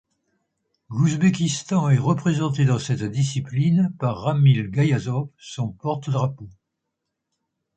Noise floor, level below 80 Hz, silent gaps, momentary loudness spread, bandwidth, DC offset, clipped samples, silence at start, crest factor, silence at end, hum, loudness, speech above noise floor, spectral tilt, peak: -80 dBFS; -56 dBFS; none; 9 LU; 9 kHz; under 0.1%; under 0.1%; 0.9 s; 16 dB; 1.25 s; none; -22 LUFS; 59 dB; -6.5 dB/octave; -6 dBFS